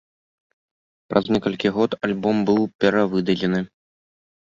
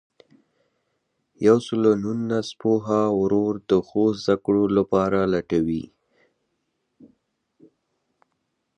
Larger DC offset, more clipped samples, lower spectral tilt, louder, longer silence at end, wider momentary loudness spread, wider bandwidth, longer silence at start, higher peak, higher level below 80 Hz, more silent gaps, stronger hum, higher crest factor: neither; neither; about the same, -7 dB/octave vs -7 dB/octave; about the same, -21 LUFS vs -22 LUFS; second, 0.75 s vs 2.9 s; about the same, 4 LU vs 6 LU; second, 7.4 kHz vs 9.8 kHz; second, 1.1 s vs 1.4 s; about the same, -2 dBFS vs -4 dBFS; about the same, -56 dBFS vs -54 dBFS; first, 2.75-2.79 s vs none; neither; about the same, 20 dB vs 20 dB